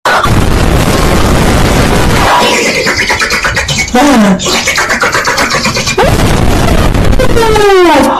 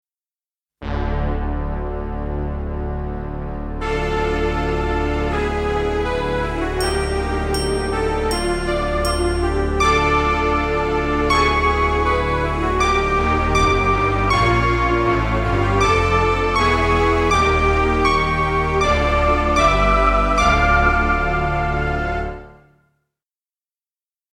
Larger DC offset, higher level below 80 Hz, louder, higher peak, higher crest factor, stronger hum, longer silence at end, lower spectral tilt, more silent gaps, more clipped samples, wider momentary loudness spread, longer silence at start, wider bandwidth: neither; first, -16 dBFS vs -24 dBFS; first, -8 LUFS vs -18 LUFS; about the same, 0 dBFS vs -2 dBFS; second, 8 dB vs 16 dB; neither; second, 0 s vs 1.8 s; second, -4 dB/octave vs -5.5 dB/octave; neither; neither; second, 4 LU vs 10 LU; second, 0.05 s vs 0.8 s; about the same, 16 kHz vs 15 kHz